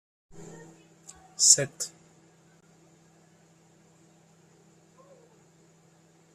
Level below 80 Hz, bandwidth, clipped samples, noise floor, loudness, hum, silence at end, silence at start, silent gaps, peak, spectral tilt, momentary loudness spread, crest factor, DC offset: -74 dBFS; 14 kHz; under 0.1%; -60 dBFS; -22 LUFS; none; 4.45 s; 0.35 s; none; -4 dBFS; -0.5 dB/octave; 30 LU; 30 dB; under 0.1%